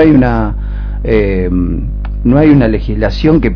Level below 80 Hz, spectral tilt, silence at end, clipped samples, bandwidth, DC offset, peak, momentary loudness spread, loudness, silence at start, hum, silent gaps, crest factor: -18 dBFS; -9.5 dB/octave; 0 s; 0.9%; 5.4 kHz; under 0.1%; 0 dBFS; 12 LU; -12 LUFS; 0 s; 50 Hz at -15 dBFS; none; 10 dB